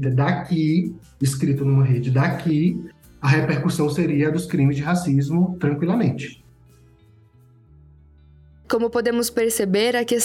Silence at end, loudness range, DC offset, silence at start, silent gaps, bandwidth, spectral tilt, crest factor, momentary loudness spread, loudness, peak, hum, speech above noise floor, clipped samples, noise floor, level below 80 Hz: 0 s; 7 LU; under 0.1%; 0 s; none; 16.5 kHz; -6 dB/octave; 16 dB; 6 LU; -21 LUFS; -4 dBFS; none; 32 dB; under 0.1%; -52 dBFS; -52 dBFS